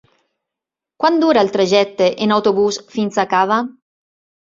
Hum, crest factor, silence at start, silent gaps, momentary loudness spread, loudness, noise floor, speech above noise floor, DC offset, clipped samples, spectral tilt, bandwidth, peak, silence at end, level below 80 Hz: none; 16 dB; 1 s; none; 6 LU; -16 LUFS; -85 dBFS; 70 dB; under 0.1%; under 0.1%; -4.5 dB/octave; 7.6 kHz; -2 dBFS; 0.8 s; -60 dBFS